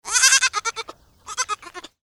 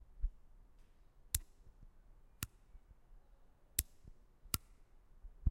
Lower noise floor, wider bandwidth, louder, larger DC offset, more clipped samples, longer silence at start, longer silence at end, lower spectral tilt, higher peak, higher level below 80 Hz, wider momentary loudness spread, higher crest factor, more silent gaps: second, -41 dBFS vs -64 dBFS; about the same, 16.5 kHz vs 16 kHz; first, -18 LUFS vs -43 LUFS; neither; neither; about the same, 0.05 s vs 0.1 s; first, 0.3 s vs 0 s; second, 3.5 dB/octave vs -2.5 dB/octave; first, 0 dBFS vs -10 dBFS; second, -60 dBFS vs -50 dBFS; about the same, 24 LU vs 24 LU; second, 22 dB vs 36 dB; neither